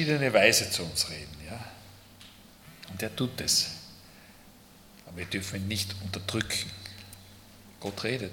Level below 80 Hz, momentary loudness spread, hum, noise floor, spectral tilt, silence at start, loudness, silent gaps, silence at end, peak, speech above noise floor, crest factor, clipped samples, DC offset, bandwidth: -60 dBFS; 26 LU; none; -54 dBFS; -3 dB/octave; 0 s; -28 LUFS; none; 0 s; -4 dBFS; 25 dB; 28 dB; under 0.1%; under 0.1%; 18 kHz